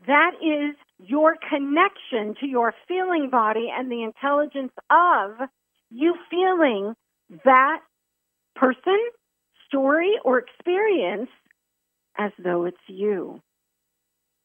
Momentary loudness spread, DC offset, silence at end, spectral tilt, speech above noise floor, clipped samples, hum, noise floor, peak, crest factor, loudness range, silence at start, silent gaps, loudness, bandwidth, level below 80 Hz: 13 LU; under 0.1%; 1.1 s; -7.5 dB/octave; 57 dB; under 0.1%; 60 Hz at -60 dBFS; -78 dBFS; -2 dBFS; 20 dB; 4 LU; 0.05 s; none; -22 LUFS; 3.7 kHz; -82 dBFS